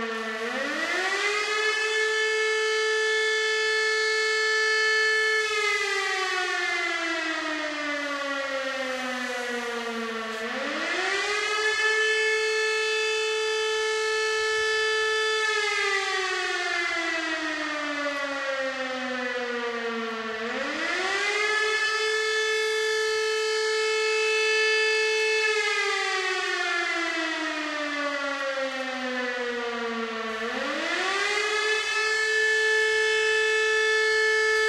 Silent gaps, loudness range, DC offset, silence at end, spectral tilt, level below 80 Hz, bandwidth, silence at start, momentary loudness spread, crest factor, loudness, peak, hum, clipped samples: none; 6 LU; under 0.1%; 0 s; 0 dB/octave; -68 dBFS; 13.5 kHz; 0 s; 8 LU; 14 dB; -25 LUFS; -12 dBFS; none; under 0.1%